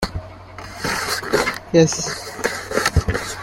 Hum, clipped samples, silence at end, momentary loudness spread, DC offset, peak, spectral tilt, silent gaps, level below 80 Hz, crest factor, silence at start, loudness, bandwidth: none; under 0.1%; 0 s; 18 LU; under 0.1%; -2 dBFS; -4 dB/octave; none; -34 dBFS; 20 dB; 0 s; -20 LUFS; 16.5 kHz